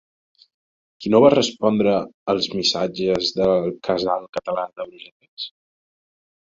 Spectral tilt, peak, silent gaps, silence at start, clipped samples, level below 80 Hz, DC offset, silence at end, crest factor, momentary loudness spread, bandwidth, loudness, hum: -5 dB/octave; -2 dBFS; 2.14-2.26 s, 4.29-4.33 s, 5.12-5.20 s, 5.28-5.37 s; 1 s; under 0.1%; -58 dBFS; under 0.1%; 1 s; 20 dB; 18 LU; 7.6 kHz; -20 LUFS; none